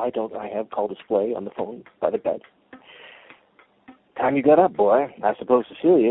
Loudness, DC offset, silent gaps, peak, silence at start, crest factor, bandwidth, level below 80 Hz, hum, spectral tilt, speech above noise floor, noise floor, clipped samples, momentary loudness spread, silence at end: -22 LUFS; under 0.1%; none; -4 dBFS; 0 s; 18 dB; 4 kHz; -64 dBFS; none; -11 dB/octave; 37 dB; -58 dBFS; under 0.1%; 14 LU; 0 s